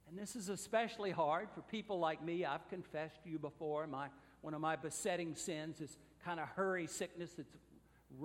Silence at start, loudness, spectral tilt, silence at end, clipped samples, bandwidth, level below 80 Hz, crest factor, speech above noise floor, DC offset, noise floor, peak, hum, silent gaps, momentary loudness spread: 0.05 s; -42 LUFS; -4.5 dB/octave; 0 s; under 0.1%; 16 kHz; -76 dBFS; 20 dB; 20 dB; under 0.1%; -62 dBFS; -22 dBFS; none; none; 12 LU